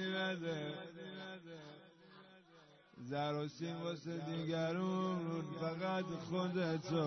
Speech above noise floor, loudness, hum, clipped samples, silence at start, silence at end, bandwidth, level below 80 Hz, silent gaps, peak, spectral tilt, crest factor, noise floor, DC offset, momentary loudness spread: 25 dB; -41 LUFS; none; under 0.1%; 0 s; 0 s; 6.2 kHz; -80 dBFS; none; -24 dBFS; -5 dB/octave; 16 dB; -65 dBFS; under 0.1%; 19 LU